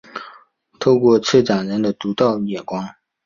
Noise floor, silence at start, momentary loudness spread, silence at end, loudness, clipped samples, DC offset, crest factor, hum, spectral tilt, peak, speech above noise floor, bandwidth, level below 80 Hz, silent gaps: -50 dBFS; 0.15 s; 17 LU; 0.35 s; -18 LUFS; under 0.1%; under 0.1%; 18 dB; none; -6 dB/octave; -2 dBFS; 33 dB; 7.4 kHz; -58 dBFS; none